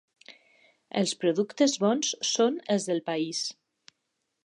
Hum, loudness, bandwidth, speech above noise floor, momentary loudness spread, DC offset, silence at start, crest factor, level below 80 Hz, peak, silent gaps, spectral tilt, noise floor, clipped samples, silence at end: none; -27 LUFS; 11.5 kHz; 53 dB; 7 LU; under 0.1%; 0.3 s; 18 dB; -84 dBFS; -12 dBFS; none; -3.5 dB/octave; -80 dBFS; under 0.1%; 0.95 s